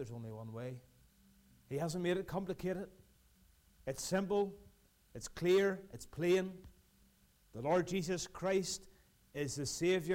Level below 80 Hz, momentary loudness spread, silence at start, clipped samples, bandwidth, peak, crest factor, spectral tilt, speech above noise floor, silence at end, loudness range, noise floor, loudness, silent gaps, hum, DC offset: -64 dBFS; 16 LU; 0 s; under 0.1%; 16 kHz; -24 dBFS; 16 dB; -5 dB/octave; 32 dB; 0 s; 6 LU; -69 dBFS; -38 LUFS; none; none; under 0.1%